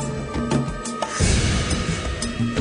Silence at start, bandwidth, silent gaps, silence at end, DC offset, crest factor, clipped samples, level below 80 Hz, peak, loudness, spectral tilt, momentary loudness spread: 0 s; 10 kHz; none; 0 s; under 0.1%; 18 dB; under 0.1%; -30 dBFS; -4 dBFS; -23 LUFS; -4.5 dB/octave; 7 LU